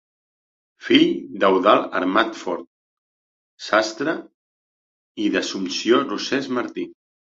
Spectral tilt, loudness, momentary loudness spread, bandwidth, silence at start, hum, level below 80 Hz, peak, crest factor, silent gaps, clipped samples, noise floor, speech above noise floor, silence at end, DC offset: -4 dB/octave; -20 LUFS; 15 LU; 7.8 kHz; 0.8 s; none; -64 dBFS; -2 dBFS; 20 dB; 2.67-3.58 s, 4.34-5.15 s; under 0.1%; under -90 dBFS; over 70 dB; 0.35 s; under 0.1%